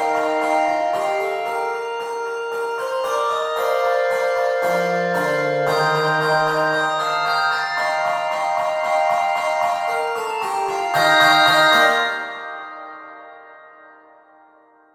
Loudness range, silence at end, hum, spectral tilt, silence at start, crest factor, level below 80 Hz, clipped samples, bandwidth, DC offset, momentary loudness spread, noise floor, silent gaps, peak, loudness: 5 LU; 1.25 s; none; -3 dB/octave; 0 s; 18 dB; -68 dBFS; under 0.1%; 17 kHz; under 0.1%; 12 LU; -52 dBFS; none; -2 dBFS; -19 LUFS